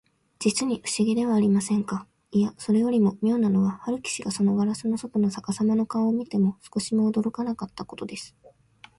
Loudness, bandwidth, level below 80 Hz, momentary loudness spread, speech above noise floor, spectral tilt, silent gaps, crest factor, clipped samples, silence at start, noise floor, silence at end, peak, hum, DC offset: -25 LUFS; 11.5 kHz; -64 dBFS; 11 LU; 30 dB; -6 dB/octave; none; 14 dB; under 0.1%; 0.4 s; -54 dBFS; 0.7 s; -10 dBFS; none; under 0.1%